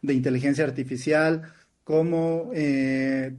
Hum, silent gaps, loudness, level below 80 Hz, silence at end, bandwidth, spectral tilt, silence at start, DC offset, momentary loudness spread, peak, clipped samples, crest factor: none; none; -24 LUFS; -64 dBFS; 0 s; 11.5 kHz; -7 dB/octave; 0.05 s; under 0.1%; 4 LU; -10 dBFS; under 0.1%; 14 dB